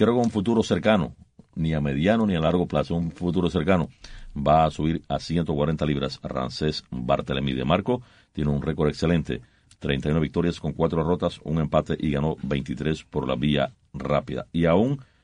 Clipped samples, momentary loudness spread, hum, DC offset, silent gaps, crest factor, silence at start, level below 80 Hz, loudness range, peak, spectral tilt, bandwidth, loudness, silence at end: under 0.1%; 8 LU; none; under 0.1%; none; 18 dB; 0 s; -42 dBFS; 2 LU; -6 dBFS; -7.5 dB/octave; 10 kHz; -25 LUFS; 0.2 s